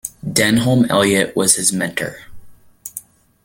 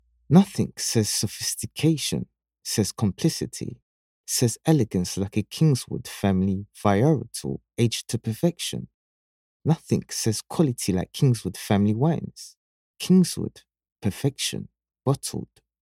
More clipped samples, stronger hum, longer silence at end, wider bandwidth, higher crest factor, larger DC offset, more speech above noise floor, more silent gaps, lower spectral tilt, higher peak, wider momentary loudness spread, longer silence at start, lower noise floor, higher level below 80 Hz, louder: neither; neither; about the same, 0.45 s vs 0.35 s; about the same, 17 kHz vs 16.5 kHz; about the same, 18 dB vs 22 dB; neither; second, 22 dB vs over 66 dB; second, none vs 3.82-4.24 s, 8.94-9.60 s, 12.57-12.94 s, 13.92-13.96 s; second, -3.5 dB/octave vs -5.5 dB/octave; about the same, 0 dBFS vs -2 dBFS; first, 18 LU vs 14 LU; second, 0.05 s vs 0.3 s; second, -38 dBFS vs under -90 dBFS; first, -50 dBFS vs -56 dBFS; first, -15 LUFS vs -24 LUFS